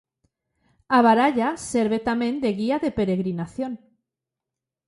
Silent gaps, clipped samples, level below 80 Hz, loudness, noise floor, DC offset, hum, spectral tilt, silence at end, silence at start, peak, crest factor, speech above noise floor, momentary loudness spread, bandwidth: none; under 0.1%; -56 dBFS; -22 LUFS; -87 dBFS; under 0.1%; none; -6 dB/octave; 1.1 s; 0.9 s; -4 dBFS; 20 dB; 65 dB; 13 LU; 11.5 kHz